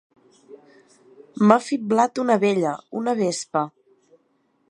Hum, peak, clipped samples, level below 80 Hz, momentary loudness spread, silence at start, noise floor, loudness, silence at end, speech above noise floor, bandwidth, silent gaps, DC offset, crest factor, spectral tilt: none; 0 dBFS; under 0.1%; -70 dBFS; 9 LU; 0.5 s; -66 dBFS; -21 LUFS; 1 s; 46 dB; 11 kHz; none; under 0.1%; 22 dB; -5.5 dB/octave